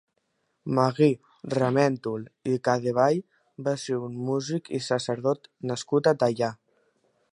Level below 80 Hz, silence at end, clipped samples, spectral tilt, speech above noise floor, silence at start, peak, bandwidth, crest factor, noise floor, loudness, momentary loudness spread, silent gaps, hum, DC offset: -70 dBFS; 0.8 s; under 0.1%; -6 dB/octave; 49 dB; 0.65 s; -6 dBFS; 11 kHz; 20 dB; -74 dBFS; -26 LUFS; 10 LU; none; none; under 0.1%